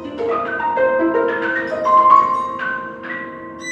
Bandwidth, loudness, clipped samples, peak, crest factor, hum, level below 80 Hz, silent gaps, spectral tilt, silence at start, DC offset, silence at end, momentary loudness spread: 8.4 kHz; -17 LUFS; under 0.1%; 0 dBFS; 18 dB; none; -56 dBFS; none; -5 dB/octave; 0 s; under 0.1%; 0 s; 16 LU